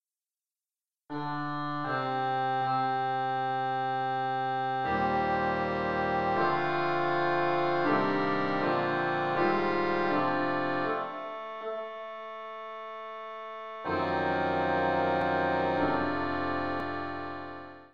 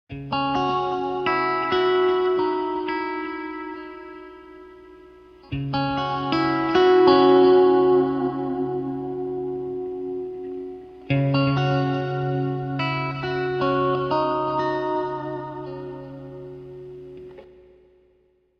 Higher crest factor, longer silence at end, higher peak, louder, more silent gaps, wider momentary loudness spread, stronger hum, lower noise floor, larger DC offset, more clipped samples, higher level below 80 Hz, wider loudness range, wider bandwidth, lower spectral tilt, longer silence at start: about the same, 14 dB vs 18 dB; second, 0 s vs 1.15 s; second, -14 dBFS vs -4 dBFS; second, -30 LUFS vs -22 LUFS; neither; second, 13 LU vs 22 LU; neither; first, under -90 dBFS vs -63 dBFS; first, 0.2% vs under 0.1%; neither; second, -60 dBFS vs -54 dBFS; second, 6 LU vs 12 LU; first, 7.2 kHz vs 6.2 kHz; about the same, -7.5 dB/octave vs -8.5 dB/octave; about the same, 0 s vs 0.1 s